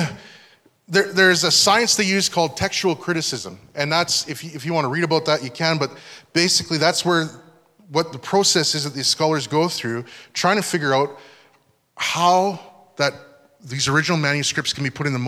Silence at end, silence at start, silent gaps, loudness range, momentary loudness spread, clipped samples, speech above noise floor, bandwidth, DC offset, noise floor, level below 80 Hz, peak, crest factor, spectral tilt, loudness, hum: 0 s; 0 s; none; 4 LU; 12 LU; under 0.1%; 40 dB; 16 kHz; under 0.1%; -60 dBFS; -60 dBFS; -2 dBFS; 20 dB; -3 dB/octave; -19 LUFS; none